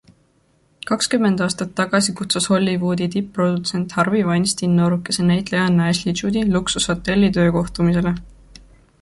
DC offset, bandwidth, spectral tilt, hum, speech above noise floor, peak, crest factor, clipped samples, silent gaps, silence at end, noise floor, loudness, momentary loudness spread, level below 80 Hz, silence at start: under 0.1%; 11.5 kHz; -5 dB/octave; none; 41 dB; -4 dBFS; 16 dB; under 0.1%; none; 0.7 s; -60 dBFS; -19 LUFS; 5 LU; -44 dBFS; 0.85 s